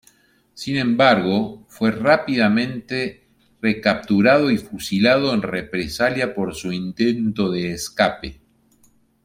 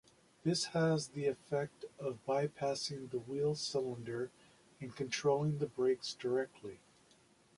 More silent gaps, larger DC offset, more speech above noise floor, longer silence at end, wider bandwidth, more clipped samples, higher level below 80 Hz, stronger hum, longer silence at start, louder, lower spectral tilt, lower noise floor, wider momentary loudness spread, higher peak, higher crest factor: neither; neither; first, 38 dB vs 31 dB; about the same, 0.9 s vs 0.8 s; first, 16 kHz vs 11.5 kHz; neither; first, -50 dBFS vs -74 dBFS; neither; about the same, 0.55 s vs 0.45 s; first, -20 LUFS vs -37 LUFS; about the same, -5.5 dB/octave vs -5 dB/octave; second, -58 dBFS vs -68 dBFS; about the same, 11 LU vs 11 LU; first, -2 dBFS vs -20 dBFS; about the same, 18 dB vs 18 dB